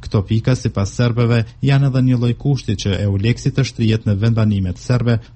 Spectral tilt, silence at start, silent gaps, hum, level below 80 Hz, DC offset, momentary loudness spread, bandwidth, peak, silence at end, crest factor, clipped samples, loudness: -7 dB/octave; 0 s; none; none; -38 dBFS; under 0.1%; 4 LU; 8.6 kHz; -2 dBFS; 0.1 s; 14 dB; under 0.1%; -17 LUFS